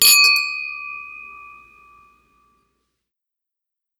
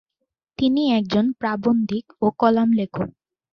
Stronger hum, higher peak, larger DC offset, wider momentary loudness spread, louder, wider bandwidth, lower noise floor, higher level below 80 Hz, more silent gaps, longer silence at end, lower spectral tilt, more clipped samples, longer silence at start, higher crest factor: neither; first, 0 dBFS vs -4 dBFS; neither; first, 27 LU vs 10 LU; first, -15 LUFS vs -21 LUFS; first, over 20 kHz vs 6.6 kHz; about the same, -81 dBFS vs -79 dBFS; second, -68 dBFS vs -56 dBFS; neither; first, 2.55 s vs 0.4 s; second, 4 dB/octave vs -8 dB/octave; neither; second, 0 s vs 0.6 s; about the same, 22 dB vs 18 dB